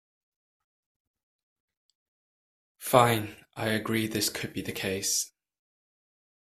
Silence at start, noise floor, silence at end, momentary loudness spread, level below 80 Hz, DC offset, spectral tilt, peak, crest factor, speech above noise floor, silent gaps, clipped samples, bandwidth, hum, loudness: 2.8 s; under -90 dBFS; 1.25 s; 13 LU; -64 dBFS; under 0.1%; -3.5 dB/octave; -4 dBFS; 28 dB; over 63 dB; none; under 0.1%; 16 kHz; none; -28 LUFS